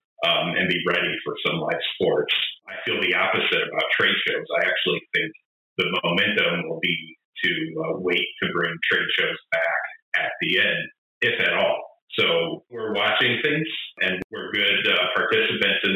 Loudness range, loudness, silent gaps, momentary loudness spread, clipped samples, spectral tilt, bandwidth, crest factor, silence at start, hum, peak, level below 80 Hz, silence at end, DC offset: 2 LU; -22 LUFS; 5.45-5.76 s, 7.25-7.33 s, 10.02-10.12 s, 10.98-11.21 s, 12.02-12.08 s, 14.24-14.30 s; 8 LU; under 0.1%; -5.5 dB/octave; 14.5 kHz; 14 dB; 0.2 s; none; -8 dBFS; -64 dBFS; 0 s; under 0.1%